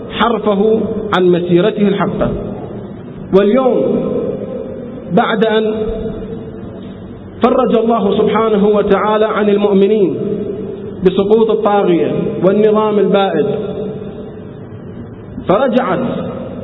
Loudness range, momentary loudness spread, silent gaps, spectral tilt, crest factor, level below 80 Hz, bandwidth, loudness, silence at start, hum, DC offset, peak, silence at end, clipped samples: 4 LU; 17 LU; none; -9.5 dB/octave; 14 dB; -40 dBFS; 4.1 kHz; -13 LUFS; 0 s; none; under 0.1%; 0 dBFS; 0 s; under 0.1%